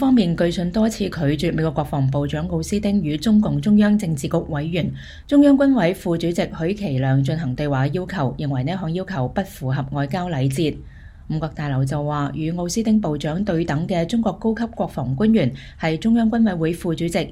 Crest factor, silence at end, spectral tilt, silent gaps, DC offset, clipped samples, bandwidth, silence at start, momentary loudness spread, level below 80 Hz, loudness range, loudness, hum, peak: 16 dB; 0 s; -7 dB/octave; none; under 0.1%; under 0.1%; 15.5 kHz; 0 s; 8 LU; -40 dBFS; 5 LU; -21 LUFS; none; -4 dBFS